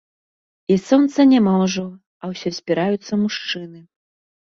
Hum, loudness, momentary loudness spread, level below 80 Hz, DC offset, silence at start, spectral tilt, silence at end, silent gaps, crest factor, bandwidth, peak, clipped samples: none; -18 LUFS; 19 LU; -62 dBFS; under 0.1%; 0.7 s; -6 dB/octave; 0.6 s; 2.07-2.20 s; 16 dB; 7.6 kHz; -2 dBFS; under 0.1%